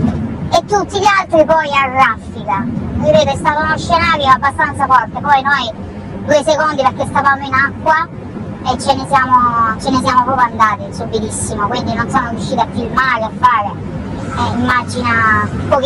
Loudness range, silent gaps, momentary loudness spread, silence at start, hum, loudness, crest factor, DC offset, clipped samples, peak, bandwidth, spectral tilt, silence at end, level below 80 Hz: 3 LU; none; 10 LU; 0 s; none; -13 LUFS; 14 dB; under 0.1%; under 0.1%; 0 dBFS; 13 kHz; -5 dB/octave; 0 s; -36 dBFS